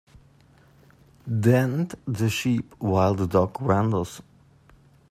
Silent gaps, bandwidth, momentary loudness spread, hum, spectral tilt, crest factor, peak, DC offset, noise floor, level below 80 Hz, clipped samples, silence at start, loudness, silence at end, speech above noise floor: none; 15 kHz; 10 LU; none; -7 dB/octave; 20 dB; -6 dBFS; under 0.1%; -56 dBFS; -56 dBFS; under 0.1%; 1.25 s; -24 LUFS; 0.9 s; 33 dB